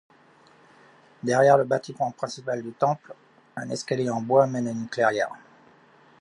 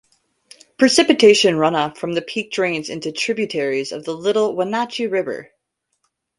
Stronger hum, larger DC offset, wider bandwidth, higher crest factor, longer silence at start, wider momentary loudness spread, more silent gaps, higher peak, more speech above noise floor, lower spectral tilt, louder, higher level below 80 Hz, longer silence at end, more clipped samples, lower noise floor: neither; neither; about the same, 11.5 kHz vs 11.5 kHz; about the same, 20 dB vs 18 dB; first, 1.25 s vs 0.8 s; about the same, 14 LU vs 13 LU; neither; second, -6 dBFS vs 0 dBFS; second, 32 dB vs 55 dB; first, -5.5 dB/octave vs -3.5 dB/octave; second, -25 LUFS vs -18 LUFS; second, -74 dBFS vs -62 dBFS; about the same, 0.85 s vs 0.95 s; neither; second, -56 dBFS vs -73 dBFS